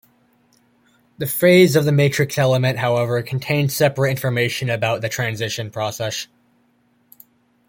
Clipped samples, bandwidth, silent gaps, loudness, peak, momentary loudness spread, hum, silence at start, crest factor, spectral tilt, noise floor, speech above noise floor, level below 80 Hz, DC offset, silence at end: under 0.1%; 17 kHz; none; -19 LUFS; -2 dBFS; 12 LU; none; 1.2 s; 18 dB; -5.5 dB/octave; -61 dBFS; 43 dB; -58 dBFS; under 0.1%; 1.45 s